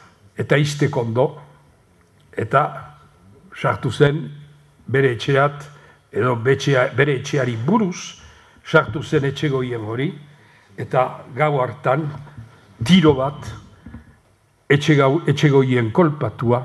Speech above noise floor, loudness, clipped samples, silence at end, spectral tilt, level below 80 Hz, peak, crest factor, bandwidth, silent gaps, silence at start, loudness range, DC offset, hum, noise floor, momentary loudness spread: 39 dB; -19 LUFS; under 0.1%; 0 s; -6.5 dB/octave; -52 dBFS; 0 dBFS; 20 dB; 12 kHz; none; 0.4 s; 4 LU; under 0.1%; none; -58 dBFS; 18 LU